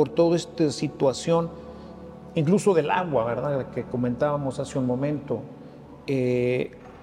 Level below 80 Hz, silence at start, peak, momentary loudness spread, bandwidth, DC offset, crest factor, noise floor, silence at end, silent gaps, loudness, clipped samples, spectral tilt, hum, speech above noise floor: -56 dBFS; 0 s; -8 dBFS; 20 LU; 12.5 kHz; under 0.1%; 16 dB; -44 dBFS; 0 s; none; -25 LUFS; under 0.1%; -6.5 dB/octave; none; 20 dB